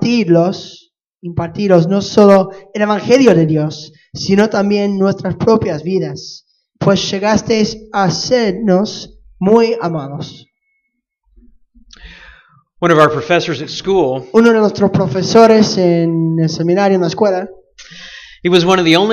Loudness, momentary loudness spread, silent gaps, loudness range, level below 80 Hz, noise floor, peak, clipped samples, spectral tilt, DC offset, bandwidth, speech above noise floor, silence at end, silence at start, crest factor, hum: -13 LUFS; 16 LU; 1.07-1.12 s; 6 LU; -48 dBFS; -69 dBFS; 0 dBFS; under 0.1%; -6 dB/octave; under 0.1%; 10 kHz; 57 dB; 0 s; 0 s; 14 dB; none